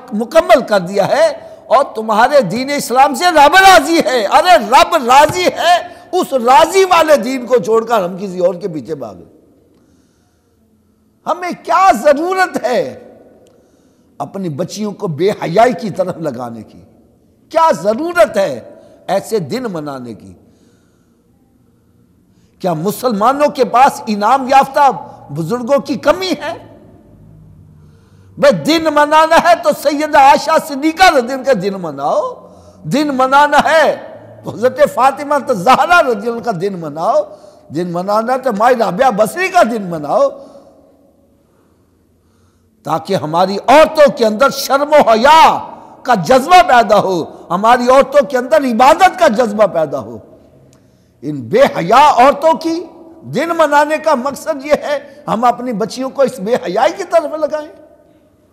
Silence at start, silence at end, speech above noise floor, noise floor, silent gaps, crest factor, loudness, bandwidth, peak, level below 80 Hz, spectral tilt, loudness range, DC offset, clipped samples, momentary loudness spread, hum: 0 s; 0.8 s; 43 dB; -54 dBFS; none; 12 dB; -12 LUFS; 16 kHz; 0 dBFS; -48 dBFS; -4 dB/octave; 10 LU; under 0.1%; under 0.1%; 14 LU; none